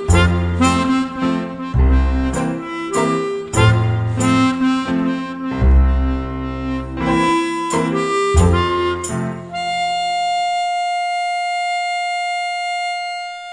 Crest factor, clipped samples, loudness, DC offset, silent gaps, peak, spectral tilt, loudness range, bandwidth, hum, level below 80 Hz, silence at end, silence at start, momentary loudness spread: 16 dB; under 0.1%; -18 LUFS; under 0.1%; none; 0 dBFS; -5.5 dB/octave; 3 LU; 10 kHz; none; -24 dBFS; 0 s; 0 s; 9 LU